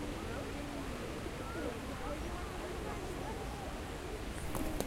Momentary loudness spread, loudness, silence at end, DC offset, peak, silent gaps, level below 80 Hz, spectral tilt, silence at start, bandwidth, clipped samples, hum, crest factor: 2 LU; -42 LUFS; 0 s; under 0.1%; -18 dBFS; none; -46 dBFS; -5 dB/octave; 0 s; 16 kHz; under 0.1%; none; 24 dB